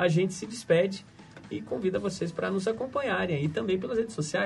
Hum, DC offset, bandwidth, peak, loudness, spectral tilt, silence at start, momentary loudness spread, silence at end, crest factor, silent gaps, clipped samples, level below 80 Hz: none; under 0.1%; 11.5 kHz; -10 dBFS; -29 LUFS; -5.5 dB/octave; 0 s; 12 LU; 0 s; 18 dB; none; under 0.1%; -62 dBFS